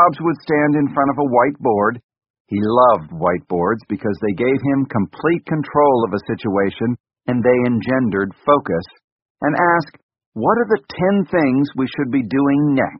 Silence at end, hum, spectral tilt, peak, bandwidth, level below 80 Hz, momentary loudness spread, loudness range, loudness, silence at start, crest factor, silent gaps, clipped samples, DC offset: 0 s; none; -6.5 dB/octave; 0 dBFS; 5.6 kHz; -52 dBFS; 8 LU; 2 LU; -18 LUFS; 0 s; 18 dB; 2.04-2.09 s, 2.30-2.34 s, 2.40-2.45 s, 7.00-7.04 s, 9.04-9.35 s, 10.03-10.09 s, 10.26-10.32 s; under 0.1%; under 0.1%